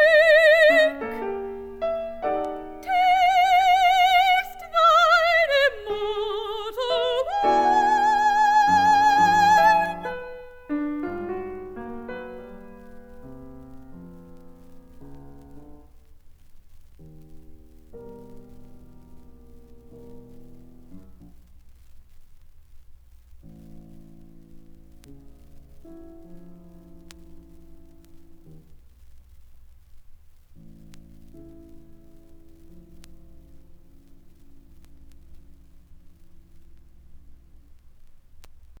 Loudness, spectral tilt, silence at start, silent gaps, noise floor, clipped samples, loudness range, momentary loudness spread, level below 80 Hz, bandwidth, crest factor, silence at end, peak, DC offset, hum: -20 LUFS; -3.5 dB/octave; 0 s; none; -48 dBFS; under 0.1%; 19 LU; 24 LU; -50 dBFS; 17 kHz; 18 dB; 0.4 s; -6 dBFS; under 0.1%; none